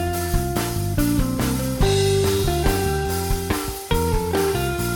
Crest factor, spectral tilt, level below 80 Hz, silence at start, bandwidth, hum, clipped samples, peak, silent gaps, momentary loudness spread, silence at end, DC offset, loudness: 14 dB; -5 dB/octave; -28 dBFS; 0 s; 19.5 kHz; none; under 0.1%; -6 dBFS; none; 5 LU; 0 s; under 0.1%; -22 LUFS